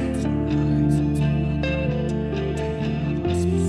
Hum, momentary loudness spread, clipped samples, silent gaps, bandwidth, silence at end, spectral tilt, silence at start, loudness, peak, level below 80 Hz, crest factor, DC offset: none; 5 LU; under 0.1%; none; 11.5 kHz; 0 s; -7.5 dB/octave; 0 s; -23 LUFS; -8 dBFS; -34 dBFS; 14 dB; under 0.1%